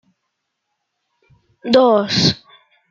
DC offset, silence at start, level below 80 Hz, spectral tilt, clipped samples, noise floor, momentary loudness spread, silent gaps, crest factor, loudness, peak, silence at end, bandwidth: under 0.1%; 1.65 s; -56 dBFS; -5 dB/octave; under 0.1%; -75 dBFS; 17 LU; none; 18 dB; -14 LUFS; -2 dBFS; 0.55 s; 7.6 kHz